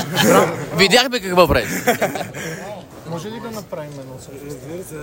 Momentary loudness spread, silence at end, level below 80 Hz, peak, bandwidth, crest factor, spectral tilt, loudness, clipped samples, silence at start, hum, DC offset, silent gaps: 20 LU; 0 s; -42 dBFS; 0 dBFS; 16.5 kHz; 18 dB; -4 dB/octave; -16 LUFS; under 0.1%; 0 s; none; under 0.1%; none